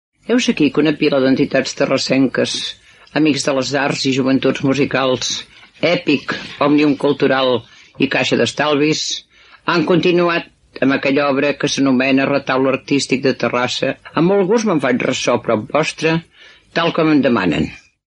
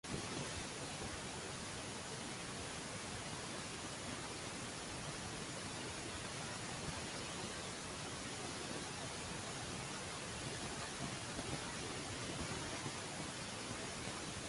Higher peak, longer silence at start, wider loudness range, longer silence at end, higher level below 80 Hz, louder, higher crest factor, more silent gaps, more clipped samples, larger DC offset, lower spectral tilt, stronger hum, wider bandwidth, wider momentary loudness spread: first, 0 dBFS vs -28 dBFS; first, 0.3 s vs 0.05 s; about the same, 1 LU vs 1 LU; first, 0.35 s vs 0 s; first, -52 dBFS vs -62 dBFS; first, -16 LUFS vs -44 LUFS; about the same, 16 dB vs 18 dB; neither; neither; neither; first, -4.5 dB/octave vs -3 dB/octave; neither; about the same, 10.5 kHz vs 11.5 kHz; first, 6 LU vs 2 LU